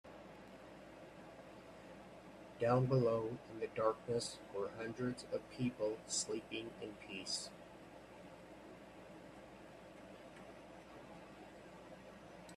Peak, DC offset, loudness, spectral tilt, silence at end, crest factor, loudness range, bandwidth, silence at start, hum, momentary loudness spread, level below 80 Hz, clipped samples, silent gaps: -22 dBFS; under 0.1%; -40 LUFS; -5 dB/octave; 0 s; 22 dB; 17 LU; 13 kHz; 0.05 s; none; 19 LU; -72 dBFS; under 0.1%; none